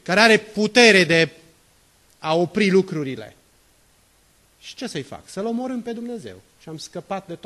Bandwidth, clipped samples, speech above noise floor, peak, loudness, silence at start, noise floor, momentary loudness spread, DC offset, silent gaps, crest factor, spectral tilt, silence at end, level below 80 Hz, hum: 13 kHz; under 0.1%; 38 dB; 0 dBFS; -19 LUFS; 0.05 s; -58 dBFS; 22 LU; under 0.1%; none; 22 dB; -4 dB/octave; 0.1 s; -62 dBFS; none